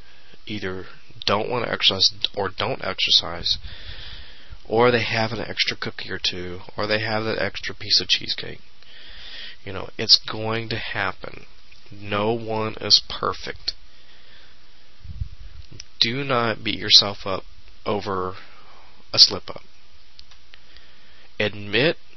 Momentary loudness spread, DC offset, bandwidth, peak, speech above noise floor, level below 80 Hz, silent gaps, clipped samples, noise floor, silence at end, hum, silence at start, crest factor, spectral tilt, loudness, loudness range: 21 LU; 2%; 6.4 kHz; 0 dBFS; 30 dB; -48 dBFS; none; under 0.1%; -53 dBFS; 0.25 s; none; 0.45 s; 24 dB; -3 dB/octave; -21 LUFS; 3 LU